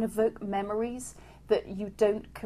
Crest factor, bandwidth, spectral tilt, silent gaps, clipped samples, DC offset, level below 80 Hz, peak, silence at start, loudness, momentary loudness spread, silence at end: 18 dB; 15 kHz; -5.5 dB/octave; none; under 0.1%; under 0.1%; -54 dBFS; -12 dBFS; 0 s; -30 LUFS; 11 LU; 0 s